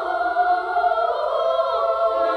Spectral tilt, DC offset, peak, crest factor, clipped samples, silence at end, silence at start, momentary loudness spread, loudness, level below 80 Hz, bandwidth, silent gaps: -4 dB/octave; under 0.1%; -8 dBFS; 12 dB; under 0.1%; 0 s; 0 s; 2 LU; -21 LUFS; -58 dBFS; 6.2 kHz; none